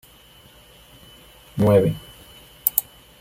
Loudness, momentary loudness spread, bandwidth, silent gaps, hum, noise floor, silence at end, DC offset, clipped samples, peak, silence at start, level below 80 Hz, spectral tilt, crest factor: -20 LUFS; 23 LU; 16.5 kHz; none; none; -50 dBFS; 0.4 s; under 0.1%; under 0.1%; 0 dBFS; 1.55 s; -52 dBFS; -6 dB/octave; 24 dB